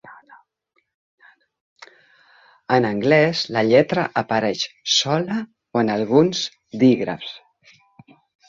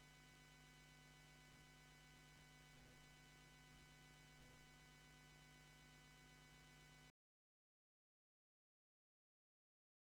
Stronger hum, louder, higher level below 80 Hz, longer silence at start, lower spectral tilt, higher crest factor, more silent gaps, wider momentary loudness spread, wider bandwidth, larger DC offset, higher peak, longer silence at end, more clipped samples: second, none vs 60 Hz at -85 dBFS; first, -19 LUFS vs -67 LUFS; first, -62 dBFS vs -78 dBFS; about the same, 0.05 s vs 0 s; about the same, -4.5 dB/octave vs -3.5 dB/octave; about the same, 20 dB vs 16 dB; first, 0.94-1.18 s, 1.60-1.76 s vs none; first, 11 LU vs 0 LU; second, 7.6 kHz vs 17.5 kHz; neither; first, -2 dBFS vs -54 dBFS; second, 1.1 s vs 2.95 s; neither